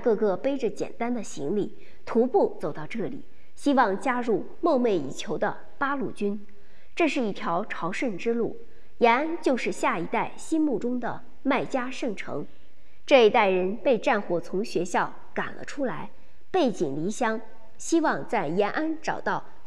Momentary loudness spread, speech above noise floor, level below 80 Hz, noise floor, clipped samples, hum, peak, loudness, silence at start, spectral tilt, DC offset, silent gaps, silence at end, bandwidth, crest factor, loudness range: 11 LU; 32 dB; -62 dBFS; -58 dBFS; under 0.1%; none; -6 dBFS; -27 LUFS; 0 s; -5 dB/octave; 2%; none; 0 s; 12 kHz; 22 dB; 5 LU